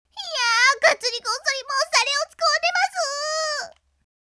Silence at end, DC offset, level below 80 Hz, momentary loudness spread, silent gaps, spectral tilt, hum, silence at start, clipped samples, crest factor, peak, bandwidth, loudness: 0.6 s; under 0.1%; -70 dBFS; 9 LU; none; 3 dB/octave; none; 0.15 s; under 0.1%; 20 dB; -2 dBFS; 11 kHz; -20 LUFS